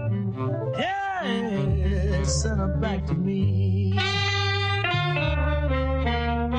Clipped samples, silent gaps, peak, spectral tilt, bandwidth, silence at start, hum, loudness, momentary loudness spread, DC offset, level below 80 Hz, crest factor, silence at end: under 0.1%; none; -10 dBFS; -5.5 dB/octave; 9.4 kHz; 0 s; none; -25 LUFS; 4 LU; under 0.1%; -30 dBFS; 14 dB; 0 s